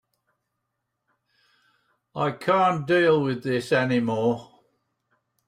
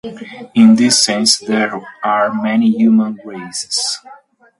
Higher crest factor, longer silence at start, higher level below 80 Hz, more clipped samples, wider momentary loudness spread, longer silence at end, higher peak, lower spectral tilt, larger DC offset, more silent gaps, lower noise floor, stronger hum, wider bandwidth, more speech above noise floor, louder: about the same, 18 dB vs 14 dB; first, 2.15 s vs 0.05 s; second, -68 dBFS vs -62 dBFS; neither; second, 8 LU vs 15 LU; first, 1.05 s vs 0.45 s; second, -8 dBFS vs 0 dBFS; first, -6.5 dB/octave vs -3 dB/octave; neither; neither; first, -80 dBFS vs -43 dBFS; neither; first, 14.5 kHz vs 11.5 kHz; first, 57 dB vs 29 dB; second, -23 LUFS vs -13 LUFS